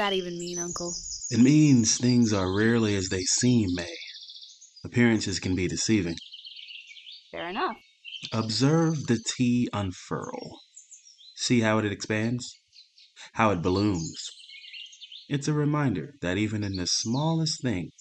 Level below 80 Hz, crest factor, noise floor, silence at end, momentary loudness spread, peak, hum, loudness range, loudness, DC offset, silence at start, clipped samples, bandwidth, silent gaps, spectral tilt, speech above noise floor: -58 dBFS; 20 dB; -56 dBFS; 0.1 s; 19 LU; -6 dBFS; none; 7 LU; -26 LUFS; under 0.1%; 0 s; under 0.1%; 9.2 kHz; none; -4.5 dB/octave; 31 dB